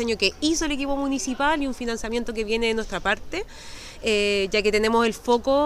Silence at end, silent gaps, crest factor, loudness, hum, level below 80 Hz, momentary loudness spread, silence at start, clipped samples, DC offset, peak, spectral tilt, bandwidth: 0 s; none; 16 dB; -24 LUFS; none; -40 dBFS; 8 LU; 0 s; under 0.1%; under 0.1%; -8 dBFS; -3 dB/octave; 15.5 kHz